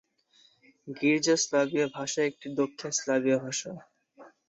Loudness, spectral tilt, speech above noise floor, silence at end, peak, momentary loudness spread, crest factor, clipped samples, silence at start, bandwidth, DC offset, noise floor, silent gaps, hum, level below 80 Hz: -28 LUFS; -3.5 dB/octave; 36 dB; 0.2 s; -12 dBFS; 10 LU; 18 dB; under 0.1%; 0.85 s; 8.4 kHz; under 0.1%; -64 dBFS; none; none; -76 dBFS